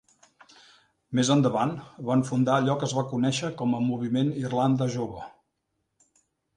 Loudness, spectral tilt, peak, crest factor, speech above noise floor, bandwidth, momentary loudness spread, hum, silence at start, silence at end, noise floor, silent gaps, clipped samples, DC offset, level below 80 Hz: -26 LUFS; -6 dB/octave; -10 dBFS; 18 dB; 53 dB; 10.5 kHz; 9 LU; none; 1.1 s; 1.25 s; -78 dBFS; none; under 0.1%; under 0.1%; -64 dBFS